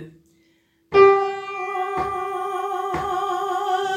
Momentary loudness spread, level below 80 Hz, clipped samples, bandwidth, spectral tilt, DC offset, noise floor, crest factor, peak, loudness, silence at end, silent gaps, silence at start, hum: 12 LU; -54 dBFS; under 0.1%; 13 kHz; -5 dB/octave; under 0.1%; -62 dBFS; 20 dB; -2 dBFS; -21 LUFS; 0 s; none; 0 s; none